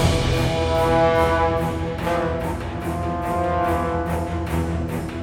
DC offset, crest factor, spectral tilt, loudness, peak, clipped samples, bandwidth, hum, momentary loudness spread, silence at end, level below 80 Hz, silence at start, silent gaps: under 0.1%; 16 dB; -6 dB/octave; -22 LUFS; -6 dBFS; under 0.1%; 17.5 kHz; none; 8 LU; 0 s; -32 dBFS; 0 s; none